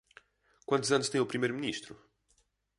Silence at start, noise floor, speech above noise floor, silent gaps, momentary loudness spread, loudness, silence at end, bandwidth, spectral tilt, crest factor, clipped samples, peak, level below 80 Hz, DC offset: 0.7 s; -73 dBFS; 42 dB; none; 18 LU; -31 LUFS; 0.85 s; 11.5 kHz; -4 dB/octave; 20 dB; under 0.1%; -14 dBFS; -74 dBFS; under 0.1%